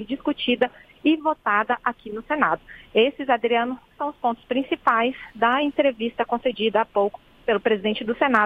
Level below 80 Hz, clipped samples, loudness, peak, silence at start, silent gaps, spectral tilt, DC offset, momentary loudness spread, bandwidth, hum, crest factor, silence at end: -58 dBFS; under 0.1%; -23 LUFS; -2 dBFS; 0 s; none; -6.5 dB/octave; under 0.1%; 7 LU; 5.4 kHz; none; 20 dB; 0 s